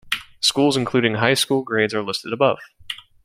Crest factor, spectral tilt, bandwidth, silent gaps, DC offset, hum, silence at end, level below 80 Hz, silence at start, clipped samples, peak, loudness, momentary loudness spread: 20 dB; -4 dB/octave; 16.5 kHz; none; under 0.1%; none; 0.3 s; -58 dBFS; 0.05 s; under 0.1%; -2 dBFS; -19 LUFS; 13 LU